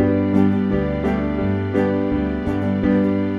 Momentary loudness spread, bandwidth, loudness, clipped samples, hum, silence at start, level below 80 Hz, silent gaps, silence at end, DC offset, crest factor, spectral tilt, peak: 4 LU; 5.8 kHz; -20 LUFS; under 0.1%; none; 0 s; -36 dBFS; none; 0 s; under 0.1%; 14 dB; -9.5 dB/octave; -4 dBFS